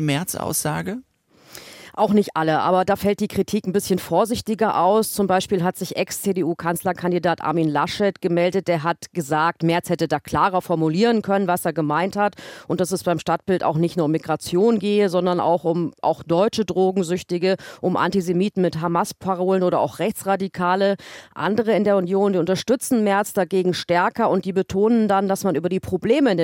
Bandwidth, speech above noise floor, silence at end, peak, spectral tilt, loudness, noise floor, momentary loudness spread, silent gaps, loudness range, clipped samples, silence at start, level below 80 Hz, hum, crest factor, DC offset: 17 kHz; 27 dB; 0 s; -6 dBFS; -5.5 dB/octave; -21 LUFS; -48 dBFS; 6 LU; none; 2 LU; under 0.1%; 0 s; -58 dBFS; none; 14 dB; under 0.1%